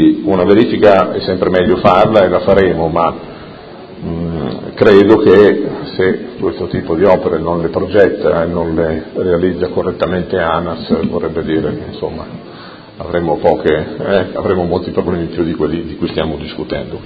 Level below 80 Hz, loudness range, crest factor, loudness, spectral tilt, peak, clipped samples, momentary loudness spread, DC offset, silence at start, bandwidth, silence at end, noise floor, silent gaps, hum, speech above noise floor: -34 dBFS; 6 LU; 12 dB; -13 LUFS; -8.5 dB/octave; 0 dBFS; 0.4%; 14 LU; under 0.1%; 0 s; 6.8 kHz; 0 s; -33 dBFS; none; none; 20 dB